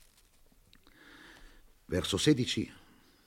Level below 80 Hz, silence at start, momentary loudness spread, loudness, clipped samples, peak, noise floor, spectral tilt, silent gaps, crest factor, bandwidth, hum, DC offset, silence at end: -60 dBFS; 1.3 s; 26 LU; -31 LUFS; under 0.1%; -14 dBFS; -63 dBFS; -4.5 dB/octave; none; 22 dB; 16.5 kHz; none; under 0.1%; 0.5 s